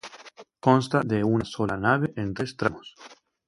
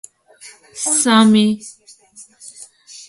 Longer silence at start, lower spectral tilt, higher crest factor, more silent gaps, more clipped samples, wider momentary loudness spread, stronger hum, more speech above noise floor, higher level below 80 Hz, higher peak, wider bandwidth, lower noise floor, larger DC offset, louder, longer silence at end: second, 0.05 s vs 0.45 s; first, -7 dB/octave vs -3.5 dB/octave; about the same, 22 dB vs 18 dB; neither; neither; second, 21 LU vs 26 LU; neither; second, 24 dB vs 30 dB; first, -54 dBFS vs -64 dBFS; about the same, -4 dBFS vs -2 dBFS; about the same, 11.5 kHz vs 11.5 kHz; about the same, -48 dBFS vs -45 dBFS; neither; second, -25 LUFS vs -14 LUFS; first, 0.35 s vs 0.1 s